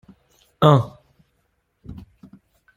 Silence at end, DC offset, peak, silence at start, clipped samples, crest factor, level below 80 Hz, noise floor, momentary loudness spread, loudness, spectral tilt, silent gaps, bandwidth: 0.85 s; under 0.1%; -2 dBFS; 0.6 s; under 0.1%; 22 dB; -54 dBFS; -69 dBFS; 26 LU; -17 LUFS; -8 dB/octave; none; 13 kHz